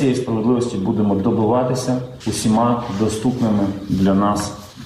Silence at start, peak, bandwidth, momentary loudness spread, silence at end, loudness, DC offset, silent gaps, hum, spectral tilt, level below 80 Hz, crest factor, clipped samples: 0 s; -6 dBFS; 14 kHz; 6 LU; 0 s; -19 LUFS; under 0.1%; none; none; -6.5 dB/octave; -46 dBFS; 12 dB; under 0.1%